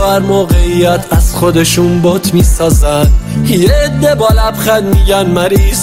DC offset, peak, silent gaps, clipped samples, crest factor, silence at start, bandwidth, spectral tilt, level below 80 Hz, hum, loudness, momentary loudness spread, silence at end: under 0.1%; 0 dBFS; none; under 0.1%; 8 dB; 0 s; 16.5 kHz; -5.5 dB/octave; -14 dBFS; none; -10 LUFS; 2 LU; 0 s